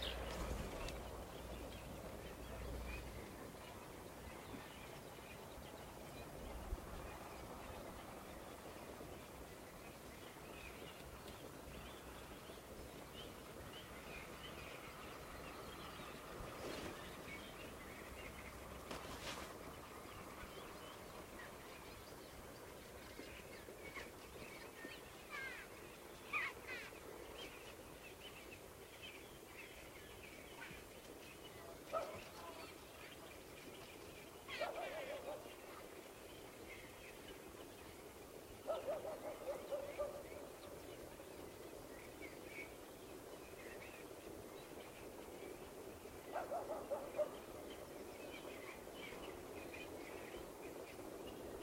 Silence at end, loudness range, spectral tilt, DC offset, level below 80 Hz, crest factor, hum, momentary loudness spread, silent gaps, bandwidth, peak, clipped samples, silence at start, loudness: 0 s; 5 LU; -4 dB/octave; under 0.1%; -62 dBFS; 22 dB; none; 9 LU; none; 16 kHz; -30 dBFS; under 0.1%; 0 s; -52 LUFS